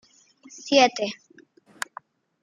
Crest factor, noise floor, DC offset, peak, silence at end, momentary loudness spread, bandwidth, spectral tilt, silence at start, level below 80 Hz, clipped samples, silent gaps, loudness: 24 dB; -55 dBFS; under 0.1%; -2 dBFS; 1.3 s; 21 LU; 13.5 kHz; -2 dB/octave; 0.55 s; -82 dBFS; under 0.1%; none; -21 LUFS